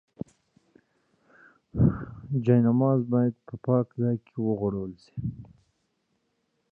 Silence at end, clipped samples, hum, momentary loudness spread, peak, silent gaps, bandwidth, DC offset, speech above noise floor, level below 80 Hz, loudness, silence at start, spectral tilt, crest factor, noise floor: 1.25 s; under 0.1%; none; 16 LU; -10 dBFS; none; 4.9 kHz; under 0.1%; 50 dB; -48 dBFS; -27 LUFS; 1.75 s; -11.5 dB/octave; 18 dB; -75 dBFS